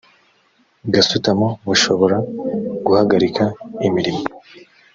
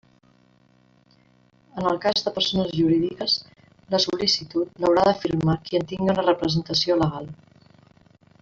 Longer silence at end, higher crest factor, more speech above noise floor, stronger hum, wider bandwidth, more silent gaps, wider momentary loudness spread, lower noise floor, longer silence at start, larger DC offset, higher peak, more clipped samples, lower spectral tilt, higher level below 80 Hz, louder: second, 0.35 s vs 1.05 s; about the same, 18 dB vs 20 dB; first, 42 dB vs 37 dB; neither; about the same, 7.8 kHz vs 7.6 kHz; neither; first, 9 LU vs 6 LU; about the same, -59 dBFS vs -59 dBFS; second, 0.85 s vs 1.75 s; neither; first, -2 dBFS vs -6 dBFS; neither; about the same, -4.5 dB/octave vs -5.5 dB/octave; about the same, -54 dBFS vs -54 dBFS; first, -17 LUFS vs -22 LUFS